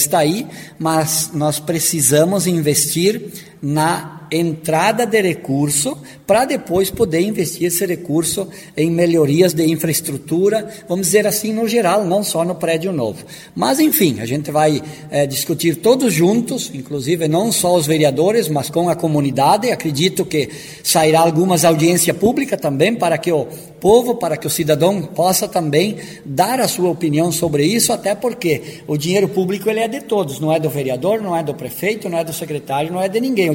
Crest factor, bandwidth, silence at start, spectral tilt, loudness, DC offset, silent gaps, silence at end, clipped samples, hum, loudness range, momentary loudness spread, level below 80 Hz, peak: 16 dB; 17 kHz; 0 s; -4.5 dB/octave; -16 LUFS; under 0.1%; none; 0 s; under 0.1%; none; 3 LU; 9 LU; -52 dBFS; 0 dBFS